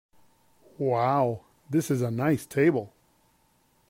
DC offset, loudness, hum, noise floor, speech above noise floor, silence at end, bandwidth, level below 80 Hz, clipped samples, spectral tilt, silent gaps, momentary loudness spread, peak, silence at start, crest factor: under 0.1%; -26 LUFS; none; -66 dBFS; 41 dB; 1 s; 16 kHz; -68 dBFS; under 0.1%; -7 dB/octave; none; 9 LU; -12 dBFS; 0.8 s; 16 dB